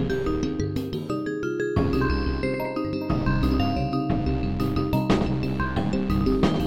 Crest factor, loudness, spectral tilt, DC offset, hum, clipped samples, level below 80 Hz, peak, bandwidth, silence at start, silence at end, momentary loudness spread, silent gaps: 18 dB; -25 LUFS; -7.5 dB/octave; 0.9%; none; under 0.1%; -32 dBFS; -6 dBFS; 16.5 kHz; 0 s; 0 s; 5 LU; none